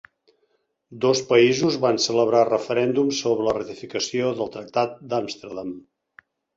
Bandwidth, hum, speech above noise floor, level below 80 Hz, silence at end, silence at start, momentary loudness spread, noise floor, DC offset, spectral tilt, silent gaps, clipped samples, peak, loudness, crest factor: 7.8 kHz; none; 48 dB; -64 dBFS; 0.75 s; 0.9 s; 14 LU; -70 dBFS; under 0.1%; -4.5 dB/octave; none; under 0.1%; -4 dBFS; -22 LUFS; 18 dB